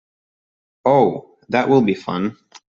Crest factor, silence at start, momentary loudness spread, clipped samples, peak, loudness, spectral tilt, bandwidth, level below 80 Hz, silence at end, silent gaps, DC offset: 18 dB; 0.85 s; 10 LU; under 0.1%; -2 dBFS; -18 LUFS; -7.5 dB/octave; 7.4 kHz; -60 dBFS; 0.4 s; none; under 0.1%